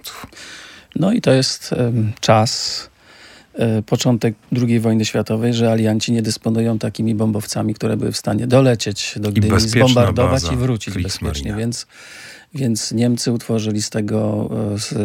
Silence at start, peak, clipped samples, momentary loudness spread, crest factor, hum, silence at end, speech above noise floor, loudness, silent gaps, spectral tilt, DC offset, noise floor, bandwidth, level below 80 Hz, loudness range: 0.05 s; -2 dBFS; under 0.1%; 14 LU; 16 dB; none; 0 s; 27 dB; -18 LUFS; none; -5.5 dB/octave; under 0.1%; -44 dBFS; 16.5 kHz; -42 dBFS; 5 LU